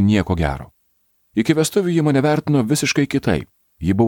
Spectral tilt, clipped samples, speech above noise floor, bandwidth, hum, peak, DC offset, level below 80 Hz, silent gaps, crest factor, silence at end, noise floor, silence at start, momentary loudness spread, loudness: -6 dB/octave; under 0.1%; 46 dB; 18.5 kHz; none; 0 dBFS; under 0.1%; -38 dBFS; none; 18 dB; 0 s; -64 dBFS; 0 s; 7 LU; -19 LUFS